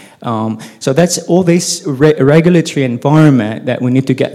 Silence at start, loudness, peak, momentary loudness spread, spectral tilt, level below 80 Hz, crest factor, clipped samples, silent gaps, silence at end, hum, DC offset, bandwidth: 0.2 s; -12 LUFS; 0 dBFS; 10 LU; -6 dB/octave; -50 dBFS; 12 dB; 1%; none; 0 s; none; under 0.1%; 14.5 kHz